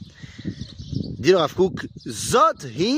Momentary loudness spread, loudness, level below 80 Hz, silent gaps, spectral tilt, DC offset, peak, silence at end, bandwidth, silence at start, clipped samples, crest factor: 17 LU; -21 LUFS; -48 dBFS; none; -5 dB/octave; under 0.1%; -4 dBFS; 0 s; 15.5 kHz; 0 s; under 0.1%; 18 dB